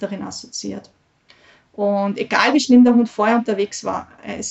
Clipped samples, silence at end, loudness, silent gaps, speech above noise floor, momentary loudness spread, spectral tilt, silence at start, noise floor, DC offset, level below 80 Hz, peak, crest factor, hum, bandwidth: under 0.1%; 0 s; -18 LUFS; none; 35 dB; 17 LU; -4.5 dB/octave; 0 s; -53 dBFS; under 0.1%; -62 dBFS; -2 dBFS; 16 dB; none; 8.2 kHz